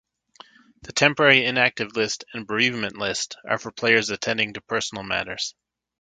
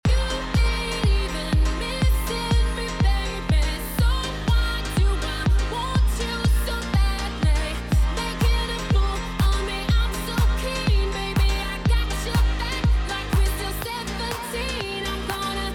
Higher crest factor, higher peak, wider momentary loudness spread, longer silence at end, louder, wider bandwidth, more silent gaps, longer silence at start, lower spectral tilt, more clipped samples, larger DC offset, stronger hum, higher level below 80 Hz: first, 24 dB vs 10 dB; first, 0 dBFS vs -12 dBFS; first, 12 LU vs 4 LU; first, 0.5 s vs 0 s; about the same, -22 LUFS vs -24 LUFS; second, 9.4 kHz vs 16.5 kHz; neither; first, 0.85 s vs 0.05 s; second, -3 dB/octave vs -5 dB/octave; neither; neither; neither; second, -60 dBFS vs -24 dBFS